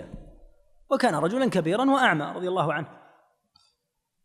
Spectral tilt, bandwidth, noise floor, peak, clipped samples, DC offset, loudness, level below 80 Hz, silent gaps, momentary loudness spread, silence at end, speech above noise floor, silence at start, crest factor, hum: -5.5 dB/octave; 14 kHz; -78 dBFS; -6 dBFS; under 0.1%; under 0.1%; -24 LUFS; -56 dBFS; none; 10 LU; 1.3 s; 54 dB; 0 s; 20 dB; none